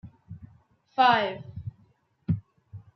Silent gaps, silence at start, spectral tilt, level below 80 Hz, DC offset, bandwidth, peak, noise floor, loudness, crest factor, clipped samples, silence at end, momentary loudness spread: none; 0.05 s; -7 dB/octave; -60 dBFS; under 0.1%; 6.2 kHz; -8 dBFS; -64 dBFS; -25 LUFS; 22 dB; under 0.1%; 0.15 s; 26 LU